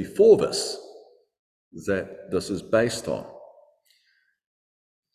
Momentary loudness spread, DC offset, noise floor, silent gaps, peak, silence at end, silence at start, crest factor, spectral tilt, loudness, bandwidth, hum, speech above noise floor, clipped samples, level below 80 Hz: 17 LU; under 0.1%; -68 dBFS; 1.39-1.71 s; -4 dBFS; 1.7 s; 0 s; 22 dB; -4.5 dB/octave; -24 LUFS; 14.5 kHz; none; 45 dB; under 0.1%; -56 dBFS